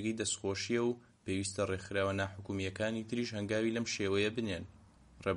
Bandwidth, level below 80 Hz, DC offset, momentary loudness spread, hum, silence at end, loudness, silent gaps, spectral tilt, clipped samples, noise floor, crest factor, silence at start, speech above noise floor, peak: 11 kHz; -66 dBFS; under 0.1%; 7 LU; none; 0 s; -36 LUFS; none; -4.5 dB/octave; under 0.1%; -58 dBFS; 16 dB; 0 s; 22 dB; -20 dBFS